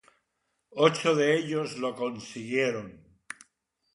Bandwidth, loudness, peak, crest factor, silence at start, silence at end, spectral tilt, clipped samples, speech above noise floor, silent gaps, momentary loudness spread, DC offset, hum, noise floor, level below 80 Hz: 11.5 kHz; -27 LUFS; -8 dBFS; 20 dB; 0.75 s; 1 s; -5 dB/octave; under 0.1%; 52 dB; none; 21 LU; under 0.1%; none; -79 dBFS; -72 dBFS